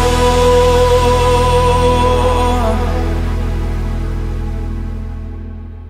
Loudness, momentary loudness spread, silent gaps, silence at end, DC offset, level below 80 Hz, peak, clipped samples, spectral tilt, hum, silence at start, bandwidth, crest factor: -14 LUFS; 15 LU; none; 0 s; under 0.1%; -18 dBFS; 0 dBFS; under 0.1%; -5.5 dB/octave; none; 0 s; 15.5 kHz; 12 dB